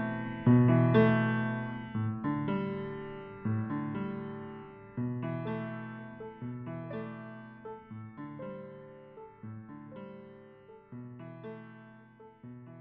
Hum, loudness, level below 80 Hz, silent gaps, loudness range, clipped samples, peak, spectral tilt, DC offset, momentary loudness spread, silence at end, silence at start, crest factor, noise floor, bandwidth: none; -32 LUFS; -62 dBFS; none; 19 LU; under 0.1%; -12 dBFS; -7.5 dB/octave; under 0.1%; 25 LU; 0 s; 0 s; 22 dB; -55 dBFS; 4 kHz